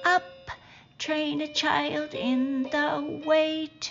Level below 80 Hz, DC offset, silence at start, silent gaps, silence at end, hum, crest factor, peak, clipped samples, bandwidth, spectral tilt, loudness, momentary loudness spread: -64 dBFS; under 0.1%; 0 s; none; 0 s; none; 18 dB; -8 dBFS; under 0.1%; 7.4 kHz; -1.5 dB/octave; -27 LUFS; 15 LU